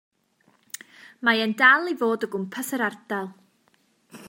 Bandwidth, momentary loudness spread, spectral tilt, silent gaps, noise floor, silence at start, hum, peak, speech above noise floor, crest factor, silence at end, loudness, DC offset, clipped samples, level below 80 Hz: 16.5 kHz; 22 LU; -3.5 dB/octave; none; -65 dBFS; 1.2 s; none; -4 dBFS; 42 dB; 22 dB; 0 s; -22 LUFS; under 0.1%; under 0.1%; -82 dBFS